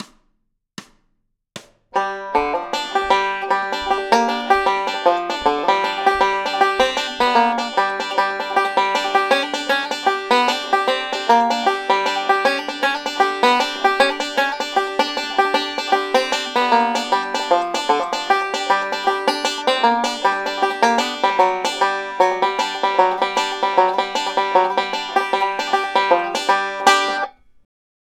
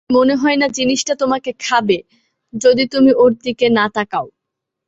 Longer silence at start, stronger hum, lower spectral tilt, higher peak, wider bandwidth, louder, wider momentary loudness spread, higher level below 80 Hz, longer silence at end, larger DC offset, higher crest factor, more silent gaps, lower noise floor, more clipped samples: about the same, 0 s vs 0.1 s; neither; second, -1.5 dB/octave vs -3.5 dB/octave; about the same, 0 dBFS vs -2 dBFS; first, 16.5 kHz vs 8 kHz; second, -18 LUFS vs -15 LUFS; second, 4 LU vs 8 LU; about the same, -56 dBFS vs -54 dBFS; about the same, 0.7 s vs 0.6 s; neither; about the same, 18 dB vs 14 dB; neither; second, -68 dBFS vs -79 dBFS; neither